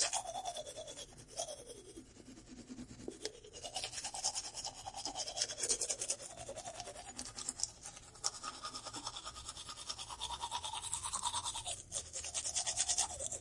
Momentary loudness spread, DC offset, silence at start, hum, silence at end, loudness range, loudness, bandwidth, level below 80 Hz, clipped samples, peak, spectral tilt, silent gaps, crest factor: 15 LU; under 0.1%; 0 s; none; 0 s; 7 LU; -40 LUFS; 11.5 kHz; -64 dBFS; under 0.1%; -14 dBFS; -0.5 dB/octave; none; 28 dB